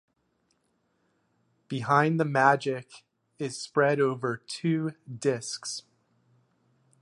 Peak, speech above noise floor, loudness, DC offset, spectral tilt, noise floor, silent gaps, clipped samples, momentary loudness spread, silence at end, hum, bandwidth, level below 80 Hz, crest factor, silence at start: -6 dBFS; 46 dB; -27 LUFS; under 0.1%; -5 dB/octave; -73 dBFS; none; under 0.1%; 14 LU; 1.2 s; none; 11.5 kHz; -76 dBFS; 24 dB; 1.7 s